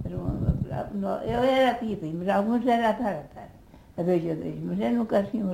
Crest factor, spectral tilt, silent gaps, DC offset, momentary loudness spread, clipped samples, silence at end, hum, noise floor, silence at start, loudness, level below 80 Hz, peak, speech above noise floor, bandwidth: 16 dB; -7.5 dB/octave; none; under 0.1%; 9 LU; under 0.1%; 0 s; none; -50 dBFS; 0 s; -26 LUFS; -44 dBFS; -10 dBFS; 25 dB; 16 kHz